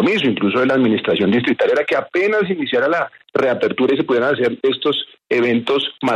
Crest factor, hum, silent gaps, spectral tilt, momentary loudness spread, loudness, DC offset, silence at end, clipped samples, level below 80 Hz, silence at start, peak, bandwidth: 12 dB; none; none; -6.5 dB/octave; 4 LU; -17 LUFS; under 0.1%; 0 s; under 0.1%; -62 dBFS; 0 s; -4 dBFS; 10.5 kHz